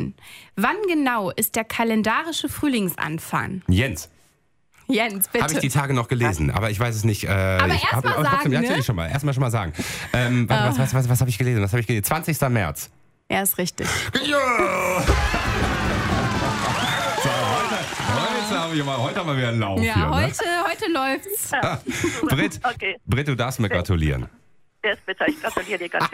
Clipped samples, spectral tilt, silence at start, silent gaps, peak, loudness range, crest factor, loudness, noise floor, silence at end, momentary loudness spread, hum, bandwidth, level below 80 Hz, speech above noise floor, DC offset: under 0.1%; -5 dB/octave; 0 s; none; -4 dBFS; 3 LU; 18 dB; -22 LUFS; -62 dBFS; 0 s; 6 LU; none; 16 kHz; -38 dBFS; 41 dB; under 0.1%